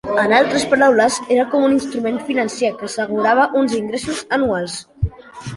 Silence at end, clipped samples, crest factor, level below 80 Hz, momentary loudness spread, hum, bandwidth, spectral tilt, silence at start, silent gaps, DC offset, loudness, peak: 0 s; under 0.1%; 16 dB; -40 dBFS; 11 LU; none; 11.5 kHz; -4.5 dB/octave; 0.05 s; none; under 0.1%; -17 LUFS; -2 dBFS